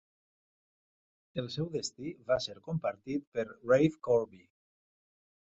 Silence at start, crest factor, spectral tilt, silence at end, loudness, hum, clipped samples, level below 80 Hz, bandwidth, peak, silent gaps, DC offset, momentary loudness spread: 1.35 s; 22 dB; -5.5 dB/octave; 1.2 s; -33 LUFS; none; under 0.1%; -68 dBFS; 8 kHz; -14 dBFS; 3.27-3.32 s; under 0.1%; 13 LU